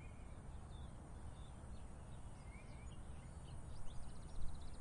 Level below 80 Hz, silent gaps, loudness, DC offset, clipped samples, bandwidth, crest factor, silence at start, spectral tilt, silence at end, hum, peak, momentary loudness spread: -54 dBFS; none; -56 LUFS; under 0.1%; under 0.1%; 11 kHz; 18 dB; 0 s; -6 dB/octave; 0 s; none; -30 dBFS; 2 LU